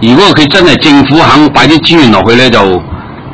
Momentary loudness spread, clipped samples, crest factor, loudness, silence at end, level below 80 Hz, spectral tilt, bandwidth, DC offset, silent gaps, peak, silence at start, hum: 7 LU; 10%; 4 dB; -4 LUFS; 0 s; -30 dBFS; -5.5 dB/octave; 8 kHz; 4%; none; 0 dBFS; 0 s; none